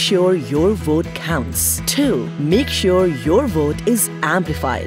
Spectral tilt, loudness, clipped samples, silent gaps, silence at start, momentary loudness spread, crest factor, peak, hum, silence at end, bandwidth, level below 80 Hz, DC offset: -4.5 dB/octave; -17 LUFS; under 0.1%; none; 0 s; 4 LU; 14 dB; -2 dBFS; none; 0 s; 16.5 kHz; -34 dBFS; under 0.1%